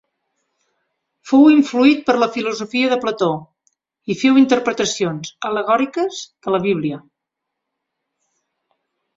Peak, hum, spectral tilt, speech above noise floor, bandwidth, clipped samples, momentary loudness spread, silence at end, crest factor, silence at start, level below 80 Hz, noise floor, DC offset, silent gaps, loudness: -2 dBFS; none; -5 dB/octave; 64 dB; 7.8 kHz; under 0.1%; 14 LU; 2.2 s; 18 dB; 1.25 s; -62 dBFS; -80 dBFS; under 0.1%; none; -17 LUFS